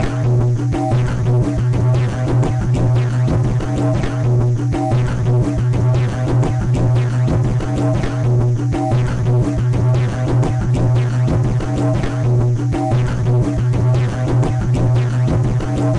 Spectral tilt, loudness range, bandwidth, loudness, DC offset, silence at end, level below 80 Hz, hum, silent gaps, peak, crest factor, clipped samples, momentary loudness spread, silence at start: -8 dB/octave; 0 LU; 9.4 kHz; -17 LUFS; under 0.1%; 0 s; -28 dBFS; none; none; -6 dBFS; 8 dB; under 0.1%; 2 LU; 0 s